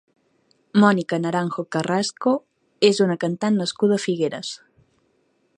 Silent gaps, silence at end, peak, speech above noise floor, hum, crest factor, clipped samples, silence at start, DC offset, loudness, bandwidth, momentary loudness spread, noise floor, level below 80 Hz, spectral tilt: none; 1 s; -2 dBFS; 45 dB; none; 20 dB; under 0.1%; 0.75 s; under 0.1%; -21 LUFS; 10.5 kHz; 8 LU; -66 dBFS; -70 dBFS; -5.5 dB/octave